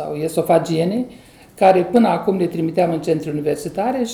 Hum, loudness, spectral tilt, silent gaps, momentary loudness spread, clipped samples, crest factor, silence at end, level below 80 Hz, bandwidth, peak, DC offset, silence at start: none; -18 LUFS; -6.5 dB/octave; none; 8 LU; under 0.1%; 18 dB; 0 s; -54 dBFS; 17.5 kHz; 0 dBFS; under 0.1%; 0 s